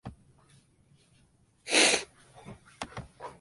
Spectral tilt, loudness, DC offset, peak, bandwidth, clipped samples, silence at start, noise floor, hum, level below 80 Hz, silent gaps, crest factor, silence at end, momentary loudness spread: -1 dB/octave; -24 LUFS; under 0.1%; -8 dBFS; 11.5 kHz; under 0.1%; 0.05 s; -65 dBFS; none; -62 dBFS; none; 26 dB; 0.1 s; 28 LU